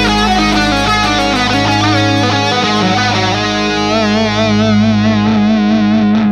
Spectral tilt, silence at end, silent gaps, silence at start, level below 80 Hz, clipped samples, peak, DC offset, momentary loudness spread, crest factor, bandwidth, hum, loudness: -5 dB/octave; 0 s; none; 0 s; -30 dBFS; under 0.1%; 0 dBFS; under 0.1%; 2 LU; 10 dB; 11 kHz; none; -11 LUFS